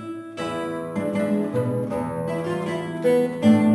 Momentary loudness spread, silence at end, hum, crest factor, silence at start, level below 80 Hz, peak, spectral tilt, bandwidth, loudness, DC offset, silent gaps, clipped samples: 9 LU; 0 s; none; 16 dB; 0 s; -58 dBFS; -6 dBFS; -7.5 dB/octave; 11 kHz; -24 LUFS; under 0.1%; none; under 0.1%